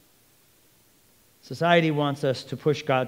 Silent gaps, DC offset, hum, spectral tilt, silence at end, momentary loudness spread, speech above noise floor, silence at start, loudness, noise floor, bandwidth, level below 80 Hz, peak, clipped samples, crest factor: none; under 0.1%; none; -6 dB/octave; 0 s; 7 LU; 37 dB; 1.5 s; -24 LUFS; -60 dBFS; 16.5 kHz; -72 dBFS; -6 dBFS; under 0.1%; 22 dB